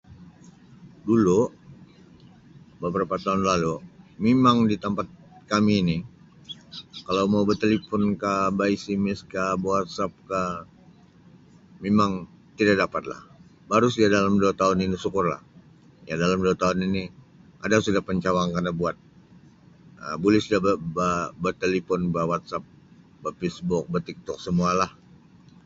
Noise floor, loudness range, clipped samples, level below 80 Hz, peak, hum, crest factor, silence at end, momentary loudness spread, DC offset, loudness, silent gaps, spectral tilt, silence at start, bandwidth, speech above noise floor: -53 dBFS; 4 LU; under 0.1%; -52 dBFS; -6 dBFS; none; 20 dB; 0.75 s; 15 LU; under 0.1%; -24 LUFS; none; -6 dB/octave; 0.1 s; 7.8 kHz; 29 dB